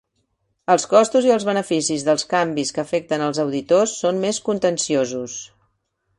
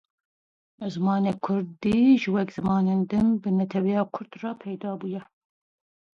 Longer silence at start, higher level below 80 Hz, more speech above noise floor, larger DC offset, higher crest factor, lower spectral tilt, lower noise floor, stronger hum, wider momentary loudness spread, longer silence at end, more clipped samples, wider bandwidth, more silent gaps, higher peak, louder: about the same, 0.7 s vs 0.8 s; about the same, -62 dBFS vs -58 dBFS; second, 51 dB vs over 66 dB; neither; about the same, 18 dB vs 16 dB; second, -4 dB/octave vs -8.5 dB/octave; second, -71 dBFS vs under -90 dBFS; neither; second, 9 LU vs 14 LU; second, 0.75 s vs 0.9 s; neither; first, 11.5 kHz vs 7 kHz; neither; first, -2 dBFS vs -10 dBFS; first, -19 LUFS vs -25 LUFS